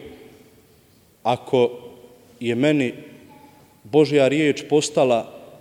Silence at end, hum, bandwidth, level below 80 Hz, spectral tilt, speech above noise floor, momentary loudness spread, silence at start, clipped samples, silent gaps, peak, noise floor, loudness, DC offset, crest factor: 0.15 s; none; 16 kHz; -66 dBFS; -5.5 dB/octave; 36 dB; 12 LU; 0 s; under 0.1%; none; -4 dBFS; -55 dBFS; -20 LUFS; under 0.1%; 18 dB